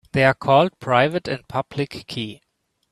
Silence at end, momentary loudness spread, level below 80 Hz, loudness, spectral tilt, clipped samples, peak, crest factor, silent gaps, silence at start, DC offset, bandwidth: 0.6 s; 13 LU; -56 dBFS; -21 LUFS; -6.5 dB/octave; under 0.1%; 0 dBFS; 20 dB; none; 0.15 s; under 0.1%; 13 kHz